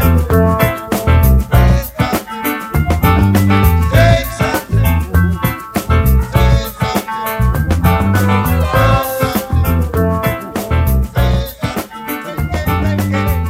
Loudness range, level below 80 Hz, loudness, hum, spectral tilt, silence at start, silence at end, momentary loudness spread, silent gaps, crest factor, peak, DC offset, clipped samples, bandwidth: 4 LU; -18 dBFS; -14 LUFS; none; -6.5 dB/octave; 0 s; 0 s; 8 LU; none; 12 dB; 0 dBFS; under 0.1%; under 0.1%; 16.5 kHz